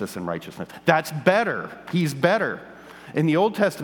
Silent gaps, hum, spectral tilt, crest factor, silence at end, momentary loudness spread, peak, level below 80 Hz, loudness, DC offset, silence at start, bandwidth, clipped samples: none; none; -6 dB/octave; 22 dB; 0 s; 14 LU; 0 dBFS; -64 dBFS; -23 LUFS; under 0.1%; 0 s; 19.5 kHz; under 0.1%